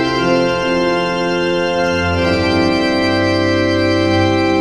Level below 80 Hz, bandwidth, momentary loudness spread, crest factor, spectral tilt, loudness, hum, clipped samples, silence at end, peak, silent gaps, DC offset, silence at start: -40 dBFS; 11 kHz; 2 LU; 12 dB; -6 dB/octave; -15 LUFS; none; under 0.1%; 0 s; -2 dBFS; none; under 0.1%; 0 s